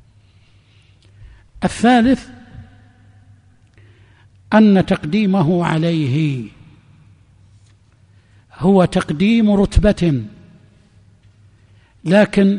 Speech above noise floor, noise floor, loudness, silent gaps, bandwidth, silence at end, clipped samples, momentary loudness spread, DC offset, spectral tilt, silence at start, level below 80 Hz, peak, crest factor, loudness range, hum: 37 dB; -51 dBFS; -15 LUFS; none; 10.5 kHz; 0 s; under 0.1%; 11 LU; under 0.1%; -7 dB/octave; 1.2 s; -34 dBFS; 0 dBFS; 18 dB; 4 LU; none